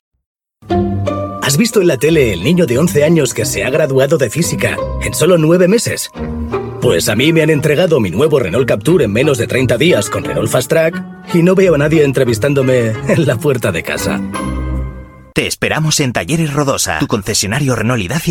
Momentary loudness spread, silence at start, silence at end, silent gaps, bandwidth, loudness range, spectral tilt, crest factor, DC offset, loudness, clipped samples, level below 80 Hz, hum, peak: 8 LU; 0.65 s; 0 s; none; 17.5 kHz; 4 LU; -5 dB/octave; 12 dB; under 0.1%; -13 LUFS; under 0.1%; -32 dBFS; none; 0 dBFS